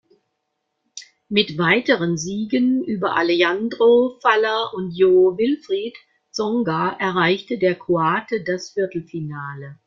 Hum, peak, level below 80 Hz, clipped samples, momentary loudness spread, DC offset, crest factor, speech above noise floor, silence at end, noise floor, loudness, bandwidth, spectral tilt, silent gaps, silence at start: none; -2 dBFS; -62 dBFS; under 0.1%; 14 LU; under 0.1%; 18 dB; 56 dB; 0.1 s; -75 dBFS; -19 LUFS; 7.6 kHz; -5 dB/octave; none; 0.95 s